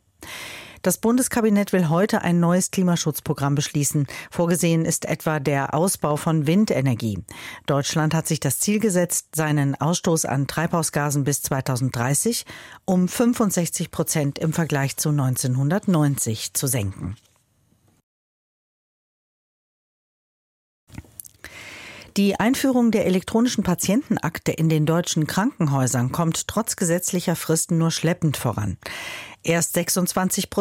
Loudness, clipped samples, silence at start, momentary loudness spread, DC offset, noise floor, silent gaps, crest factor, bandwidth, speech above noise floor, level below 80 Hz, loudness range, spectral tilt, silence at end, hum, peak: -22 LUFS; under 0.1%; 0.2 s; 11 LU; under 0.1%; -63 dBFS; 18.03-20.87 s; 14 dB; 16.5 kHz; 41 dB; -54 dBFS; 3 LU; -5 dB/octave; 0 s; none; -8 dBFS